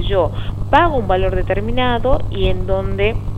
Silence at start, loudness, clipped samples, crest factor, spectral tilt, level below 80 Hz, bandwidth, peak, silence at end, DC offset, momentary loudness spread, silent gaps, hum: 0 s; -18 LUFS; under 0.1%; 16 dB; -8 dB/octave; -22 dBFS; 7.8 kHz; 0 dBFS; 0 s; under 0.1%; 6 LU; none; 50 Hz at -25 dBFS